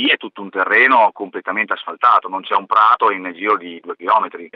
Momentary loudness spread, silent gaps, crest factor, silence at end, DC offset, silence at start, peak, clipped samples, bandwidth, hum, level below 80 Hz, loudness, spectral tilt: 11 LU; none; 16 dB; 0.1 s; under 0.1%; 0 s; -2 dBFS; under 0.1%; 6.2 kHz; none; -84 dBFS; -15 LUFS; -5 dB/octave